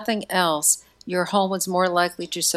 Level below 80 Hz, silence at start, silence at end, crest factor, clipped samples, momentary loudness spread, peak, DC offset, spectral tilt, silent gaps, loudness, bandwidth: -64 dBFS; 0 s; 0 s; 18 dB; under 0.1%; 6 LU; -6 dBFS; under 0.1%; -2.5 dB/octave; none; -22 LUFS; 16 kHz